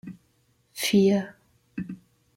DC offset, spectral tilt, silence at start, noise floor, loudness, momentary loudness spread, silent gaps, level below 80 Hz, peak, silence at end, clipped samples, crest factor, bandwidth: under 0.1%; -5 dB/octave; 0.05 s; -67 dBFS; -24 LUFS; 23 LU; none; -64 dBFS; -10 dBFS; 0.4 s; under 0.1%; 18 dB; 16.5 kHz